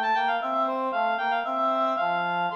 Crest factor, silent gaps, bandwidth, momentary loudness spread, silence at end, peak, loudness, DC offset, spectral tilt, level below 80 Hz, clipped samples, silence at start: 10 dB; none; 7 kHz; 2 LU; 0 s; -14 dBFS; -25 LUFS; under 0.1%; -5.5 dB/octave; -78 dBFS; under 0.1%; 0 s